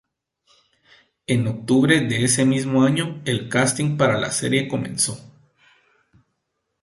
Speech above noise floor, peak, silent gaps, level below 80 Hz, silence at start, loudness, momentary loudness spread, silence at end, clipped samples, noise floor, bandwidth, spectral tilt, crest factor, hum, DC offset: 56 dB; -2 dBFS; none; -56 dBFS; 1.3 s; -20 LUFS; 7 LU; 1.6 s; under 0.1%; -76 dBFS; 12 kHz; -4.5 dB/octave; 20 dB; none; under 0.1%